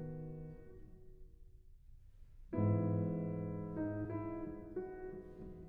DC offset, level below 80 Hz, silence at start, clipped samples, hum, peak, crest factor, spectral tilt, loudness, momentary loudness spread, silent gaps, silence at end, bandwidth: under 0.1%; -58 dBFS; 0 s; under 0.1%; none; -24 dBFS; 18 dB; -12 dB/octave; -41 LUFS; 21 LU; none; 0 s; 2.8 kHz